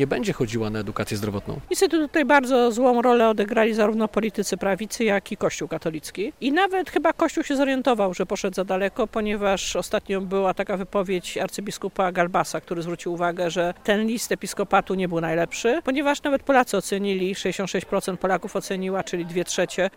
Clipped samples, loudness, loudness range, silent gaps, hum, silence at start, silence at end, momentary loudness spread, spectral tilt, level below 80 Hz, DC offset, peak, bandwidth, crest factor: under 0.1%; -23 LUFS; 5 LU; none; none; 0 s; 0.1 s; 9 LU; -4.5 dB/octave; -50 dBFS; 0.2%; -4 dBFS; 16.5 kHz; 18 dB